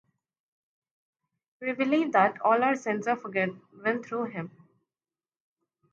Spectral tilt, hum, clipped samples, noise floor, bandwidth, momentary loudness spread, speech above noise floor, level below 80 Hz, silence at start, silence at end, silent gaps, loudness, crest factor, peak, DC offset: -6 dB/octave; none; under 0.1%; under -90 dBFS; 7.8 kHz; 12 LU; over 63 dB; -82 dBFS; 1.6 s; 1.45 s; none; -27 LUFS; 22 dB; -8 dBFS; under 0.1%